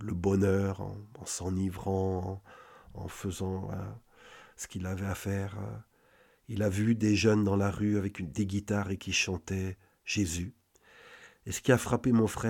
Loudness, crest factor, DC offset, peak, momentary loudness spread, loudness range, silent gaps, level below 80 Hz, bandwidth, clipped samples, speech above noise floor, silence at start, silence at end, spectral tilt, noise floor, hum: -31 LUFS; 20 dB; under 0.1%; -10 dBFS; 17 LU; 9 LU; none; -56 dBFS; 17 kHz; under 0.1%; 34 dB; 0 s; 0 s; -5.5 dB/octave; -64 dBFS; none